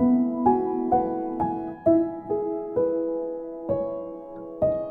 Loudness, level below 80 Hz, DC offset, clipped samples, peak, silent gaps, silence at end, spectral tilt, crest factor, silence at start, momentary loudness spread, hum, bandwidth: -25 LUFS; -54 dBFS; under 0.1%; under 0.1%; -8 dBFS; none; 0 s; -12 dB/octave; 18 dB; 0 s; 11 LU; none; 2.7 kHz